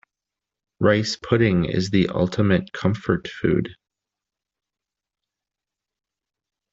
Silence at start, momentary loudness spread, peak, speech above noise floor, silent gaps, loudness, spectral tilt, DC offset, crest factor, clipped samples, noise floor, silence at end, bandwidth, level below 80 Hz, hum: 0.8 s; 5 LU; -4 dBFS; 67 dB; none; -21 LUFS; -6.5 dB/octave; under 0.1%; 20 dB; under 0.1%; -87 dBFS; 3 s; 7.8 kHz; -50 dBFS; none